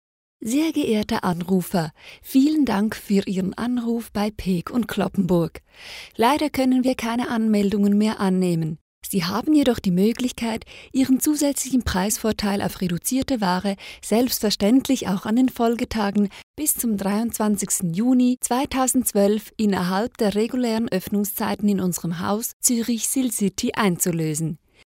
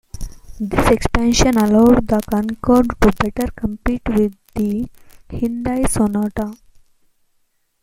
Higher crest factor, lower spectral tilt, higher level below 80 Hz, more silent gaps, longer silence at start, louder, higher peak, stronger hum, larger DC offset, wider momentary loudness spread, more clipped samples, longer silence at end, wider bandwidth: about the same, 18 dB vs 18 dB; about the same, -5 dB/octave vs -5.5 dB/octave; second, -48 dBFS vs -28 dBFS; first, 8.81-9.01 s, 16.43-16.54 s, 22.53-22.60 s vs none; first, 0.4 s vs 0.15 s; second, -22 LUFS vs -17 LUFS; second, -4 dBFS vs 0 dBFS; neither; neither; second, 7 LU vs 15 LU; neither; second, 0.3 s vs 1.3 s; about the same, 16 kHz vs 16.5 kHz